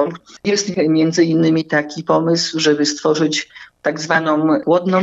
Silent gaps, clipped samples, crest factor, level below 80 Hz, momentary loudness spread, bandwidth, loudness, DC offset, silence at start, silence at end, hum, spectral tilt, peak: none; under 0.1%; 14 dB; -64 dBFS; 8 LU; 8 kHz; -16 LUFS; under 0.1%; 0 s; 0 s; none; -4.5 dB/octave; -2 dBFS